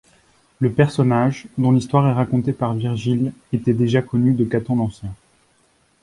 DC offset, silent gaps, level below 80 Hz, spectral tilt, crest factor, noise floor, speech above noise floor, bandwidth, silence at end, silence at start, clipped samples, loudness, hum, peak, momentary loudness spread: under 0.1%; none; -50 dBFS; -8.5 dB/octave; 18 dB; -60 dBFS; 42 dB; 11 kHz; 0.9 s; 0.6 s; under 0.1%; -19 LUFS; none; -2 dBFS; 6 LU